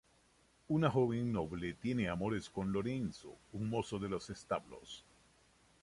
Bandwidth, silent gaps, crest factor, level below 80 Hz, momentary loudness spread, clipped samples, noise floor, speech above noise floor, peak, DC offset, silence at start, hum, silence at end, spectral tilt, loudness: 11.5 kHz; none; 20 dB; -62 dBFS; 17 LU; under 0.1%; -70 dBFS; 33 dB; -18 dBFS; under 0.1%; 0.7 s; none; 0.85 s; -7 dB/octave; -38 LUFS